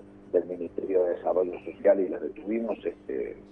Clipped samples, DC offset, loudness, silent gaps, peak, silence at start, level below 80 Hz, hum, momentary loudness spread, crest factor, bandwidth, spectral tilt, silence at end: under 0.1%; under 0.1%; -29 LUFS; none; -10 dBFS; 0 s; -62 dBFS; 50 Hz at -55 dBFS; 10 LU; 18 dB; 3.7 kHz; -9 dB/octave; 0 s